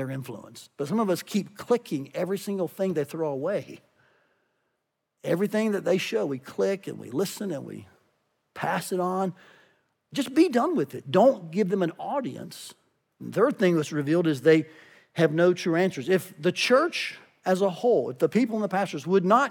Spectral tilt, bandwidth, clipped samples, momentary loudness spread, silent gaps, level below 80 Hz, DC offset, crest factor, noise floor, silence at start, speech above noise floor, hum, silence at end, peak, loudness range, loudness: -6 dB/octave; 18.5 kHz; under 0.1%; 15 LU; none; -82 dBFS; under 0.1%; 20 dB; -79 dBFS; 0 s; 54 dB; none; 0 s; -6 dBFS; 7 LU; -26 LUFS